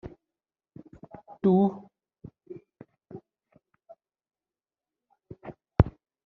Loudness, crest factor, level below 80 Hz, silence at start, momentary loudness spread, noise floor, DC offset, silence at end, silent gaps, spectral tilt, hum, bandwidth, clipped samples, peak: -26 LUFS; 30 dB; -44 dBFS; 0.05 s; 28 LU; under -90 dBFS; under 0.1%; 0.35 s; none; -10 dB/octave; none; 4.2 kHz; under 0.1%; -2 dBFS